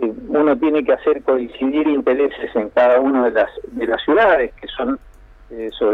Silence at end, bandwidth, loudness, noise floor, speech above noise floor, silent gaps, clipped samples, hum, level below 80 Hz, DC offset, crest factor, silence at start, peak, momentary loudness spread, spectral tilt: 0 s; 5.2 kHz; -17 LUFS; -39 dBFS; 23 dB; none; under 0.1%; none; -46 dBFS; under 0.1%; 14 dB; 0 s; -4 dBFS; 11 LU; -7 dB/octave